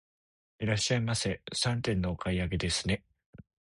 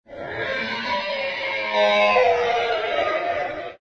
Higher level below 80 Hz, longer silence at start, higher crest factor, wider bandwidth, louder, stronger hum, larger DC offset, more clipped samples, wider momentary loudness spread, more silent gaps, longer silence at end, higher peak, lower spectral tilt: first, -46 dBFS vs -58 dBFS; first, 0.6 s vs 0.1 s; about the same, 18 dB vs 16 dB; first, 11.5 kHz vs 8 kHz; second, -31 LUFS vs -21 LUFS; neither; neither; neither; second, 5 LU vs 10 LU; first, 3.26-3.33 s vs none; first, 0.35 s vs 0.05 s; second, -14 dBFS vs -6 dBFS; about the same, -4.5 dB/octave vs -3.5 dB/octave